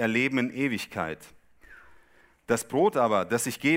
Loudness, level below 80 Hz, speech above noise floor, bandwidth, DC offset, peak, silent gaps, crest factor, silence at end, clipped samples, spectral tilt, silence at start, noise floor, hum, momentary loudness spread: -27 LUFS; -64 dBFS; 33 dB; 16 kHz; under 0.1%; -10 dBFS; none; 18 dB; 0 s; under 0.1%; -4.5 dB/octave; 0 s; -59 dBFS; none; 10 LU